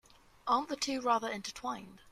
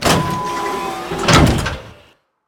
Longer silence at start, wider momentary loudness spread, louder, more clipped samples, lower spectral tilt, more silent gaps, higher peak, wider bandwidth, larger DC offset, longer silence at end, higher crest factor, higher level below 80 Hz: first, 0.45 s vs 0 s; about the same, 11 LU vs 12 LU; second, -34 LUFS vs -16 LUFS; neither; second, -2.5 dB/octave vs -4.5 dB/octave; neither; second, -16 dBFS vs 0 dBFS; second, 14.5 kHz vs 18.5 kHz; neither; second, 0 s vs 0.55 s; about the same, 18 dB vs 18 dB; second, -68 dBFS vs -28 dBFS